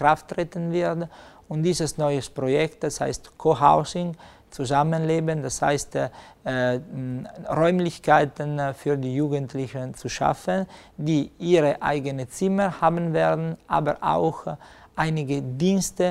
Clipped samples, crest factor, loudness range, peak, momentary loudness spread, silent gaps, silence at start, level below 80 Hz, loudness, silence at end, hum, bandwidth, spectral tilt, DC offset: under 0.1%; 20 dB; 2 LU; -4 dBFS; 12 LU; none; 0 s; -52 dBFS; -24 LUFS; 0 s; none; 15 kHz; -6 dB/octave; under 0.1%